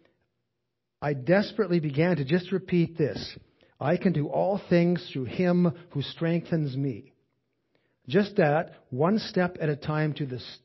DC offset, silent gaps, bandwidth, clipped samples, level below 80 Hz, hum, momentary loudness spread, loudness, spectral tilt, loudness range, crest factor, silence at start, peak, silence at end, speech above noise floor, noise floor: under 0.1%; none; 6 kHz; under 0.1%; -62 dBFS; none; 10 LU; -27 LUFS; -8.5 dB/octave; 2 LU; 18 dB; 1 s; -8 dBFS; 0.1 s; 57 dB; -83 dBFS